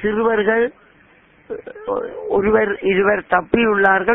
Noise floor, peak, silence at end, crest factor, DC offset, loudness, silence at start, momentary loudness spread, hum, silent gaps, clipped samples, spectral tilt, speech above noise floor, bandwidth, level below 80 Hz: -51 dBFS; 0 dBFS; 0 s; 18 dB; under 0.1%; -17 LUFS; 0 s; 14 LU; none; none; under 0.1%; -9 dB/octave; 34 dB; 3.9 kHz; -48 dBFS